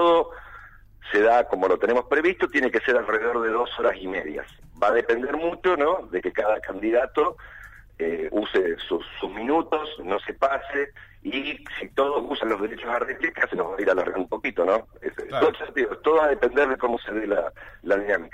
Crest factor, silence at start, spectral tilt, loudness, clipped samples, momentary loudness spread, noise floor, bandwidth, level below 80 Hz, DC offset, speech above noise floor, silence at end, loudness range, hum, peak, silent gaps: 16 dB; 0 s; -5.5 dB/octave; -24 LUFS; under 0.1%; 11 LU; -47 dBFS; 8.8 kHz; -52 dBFS; under 0.1%; 23 dB; 0.05 s; 5 LU; none; -8 dBFS; none